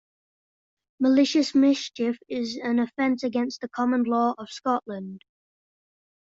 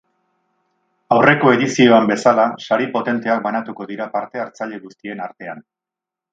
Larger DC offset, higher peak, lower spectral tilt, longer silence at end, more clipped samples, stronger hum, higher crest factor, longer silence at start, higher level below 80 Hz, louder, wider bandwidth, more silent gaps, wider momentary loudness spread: neither; second, -10 dBFS vs 0 dBFS; about the same, -4.5 dB/octave vs -5.5 dB/octave; first, 1.15 s vs 0.75 s; neither; neither; about the same, 16 dB vs 18 dB; about the same, 1 s vs 1.1 s; second, -72 dBFS vs -62 dBFS; second, -24 LUFS vs -16 LUFS; second, 7.8 kHz vs 9 kHz; neither; second, 10 LU vs 18 LU